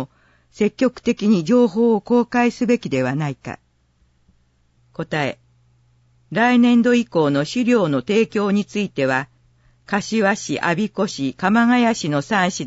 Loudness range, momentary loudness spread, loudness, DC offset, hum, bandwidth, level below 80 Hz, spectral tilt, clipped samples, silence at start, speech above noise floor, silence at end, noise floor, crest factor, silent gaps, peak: 7 LU; 11 LU; -19 LUFS; under 0.1%; none; 8 kHz; -58 dBFS; -5.5 dB/octave; under 0.1%; 0 s; 43 dB; 0 s; -61 dBFS; 14 dB; none; -6 dBFS